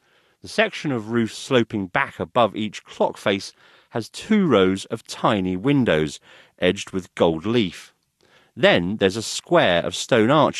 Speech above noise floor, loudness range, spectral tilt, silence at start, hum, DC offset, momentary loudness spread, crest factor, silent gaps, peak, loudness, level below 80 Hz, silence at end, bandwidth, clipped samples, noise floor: 38 dB; 2 LU; -5 dB/octave; 0.45 s; none; under 0.1%; 12 LU; 18 dB; none; -4 dBFS; -21 LUFS; -58 dBFS; 0 s; 13 kHz; under 0.1%; -59 dBFS